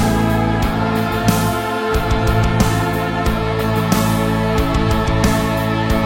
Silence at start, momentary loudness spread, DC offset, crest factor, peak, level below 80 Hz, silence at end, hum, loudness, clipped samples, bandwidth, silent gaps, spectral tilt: 0 s; 3 LU; under 0.1%; 16 dB; 0 dBFS; -24 dBFS; 0 s; none; -17 LUFS; under 0.1%; 17 kHz; none; -6 dB/octave